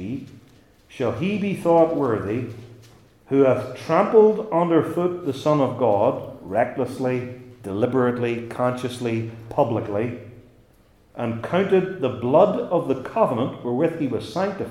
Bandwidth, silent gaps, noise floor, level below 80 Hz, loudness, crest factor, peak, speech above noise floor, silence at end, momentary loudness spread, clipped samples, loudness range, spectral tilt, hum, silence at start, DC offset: 13 kHz; none; -56 dBFS; -60 dBFS; -22 LUFS; 20 dB; -2 dBFS; 34 dB; 0 s; 11 LU; under 0.1%; 5 LU; -7.5 dB/octave; none; 0 s; under 0.1%